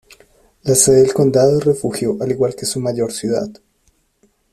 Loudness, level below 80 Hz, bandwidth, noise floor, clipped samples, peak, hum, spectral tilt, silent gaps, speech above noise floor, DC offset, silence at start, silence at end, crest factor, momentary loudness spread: -16 LUFS; -50 dBFS; 14.5 kHz; -61 dBFS; under 0.1%; 0 dBFS; none; -5 dB/octave; none; 45 dB; under 0.1%; 0.65 s; 1 s; 16 dB; 10 LU